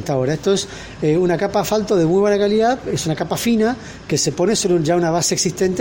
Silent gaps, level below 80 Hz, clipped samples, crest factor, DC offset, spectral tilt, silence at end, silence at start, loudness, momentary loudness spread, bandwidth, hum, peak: none; -46 dBFS; under 0.1%; 12 dB; under 0.1%; -4.5 dB/octave; 0 s; 0 s; -18 LUFS; 6 LU; 16.5 kHz; none; -6 dBFS